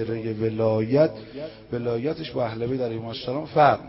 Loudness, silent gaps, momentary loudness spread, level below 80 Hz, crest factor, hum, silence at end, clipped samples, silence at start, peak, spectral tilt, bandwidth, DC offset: -25 LUFS; none; 12 LU; -54 dBFS; 20 dB; none; 0 s; under 0.1%; 0 s; -4 dBFS; -11 dB/octave; 5.8 kHz; under 0.1%